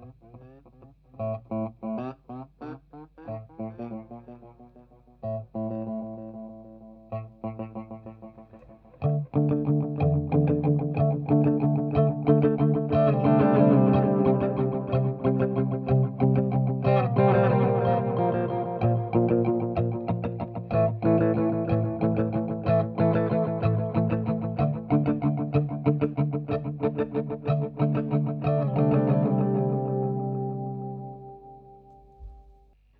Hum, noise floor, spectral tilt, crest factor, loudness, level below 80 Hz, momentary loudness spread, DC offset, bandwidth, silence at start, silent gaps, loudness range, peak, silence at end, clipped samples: none; -57 dBFS; -12.5 dB/octave; 18 dB; -25 LUFS; -52 dBFS; 17 LU; under 0.1%; 4.8 kHz; 0 s; none; 15 LU; -8 dBFS; 0.6 s; under 0.1%